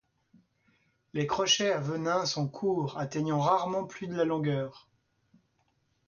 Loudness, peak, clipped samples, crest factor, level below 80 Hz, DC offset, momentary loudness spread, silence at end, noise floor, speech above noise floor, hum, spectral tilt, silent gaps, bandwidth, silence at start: -30 LUFS; -12 dBFS; under 0.1%; 18 dB; -68 dBFS; under 0.1%; 9 LU; 1.3 s; -74 dBFS; 44 dB; none; -4.5 dB/octave; none; 7.2 kHz; 1.15 s